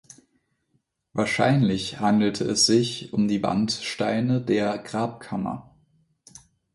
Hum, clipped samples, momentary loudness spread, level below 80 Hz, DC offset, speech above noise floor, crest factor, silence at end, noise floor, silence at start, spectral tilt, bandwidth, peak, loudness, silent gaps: none; under 0.1%; 11 LU; -58 dBFS; under 0.1%; 48 dB; 18 dB; 1.15 s; -72 dBFS; 1.15 s; -4.5 dB/octave; 11.5 kHz; -6 dBFS; -24 LUFS; none